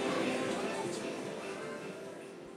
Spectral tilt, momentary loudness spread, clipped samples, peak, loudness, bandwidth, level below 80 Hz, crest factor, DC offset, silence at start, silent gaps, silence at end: -4 dB/octave; 12 LU; under 0.1%; -22 dBFS; -38 LUFS; 15.5 kHz; -74 dBFS; 16 dB; under 0.1%; 0 s; none; 0 s